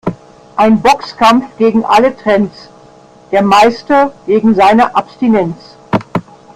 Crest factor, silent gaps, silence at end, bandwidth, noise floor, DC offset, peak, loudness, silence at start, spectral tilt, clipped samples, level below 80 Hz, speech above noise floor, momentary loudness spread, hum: 12 dB; none; 0.35 s; 14.5 kHz; -40 dBFS; under 0.1%; 0 dBFS; -11 LUFS; 0.05 s; -6 dB/octave; under 0.1%; -44 dBFS; 30 dB; 12 LU; none